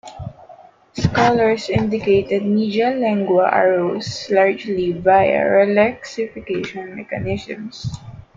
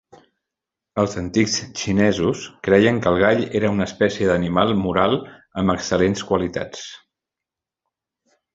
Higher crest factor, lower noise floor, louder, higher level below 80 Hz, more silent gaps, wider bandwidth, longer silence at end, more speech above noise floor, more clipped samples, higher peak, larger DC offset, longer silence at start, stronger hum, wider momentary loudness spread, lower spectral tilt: about the same, 16 dB vs 20 dB; second, -45 dBFS vs -87 dBFS; about the same, -18 LUFS vs -20 LUFS; about the same, -48 dBFS vs -46 dBFS; neither; about the same, 7.8 kHz vs 8 kHz; second, 0.15 s vs 1.6 s; second, 27 dB vs 68 dB; neither; about the same, -2 dBFS vs -2 dBFS; neither; second, 0.05 s vs 0.95 s; neither; first, 15 LU vs 10 LU; first, -6.5 dB/octave vs -5 dB/octave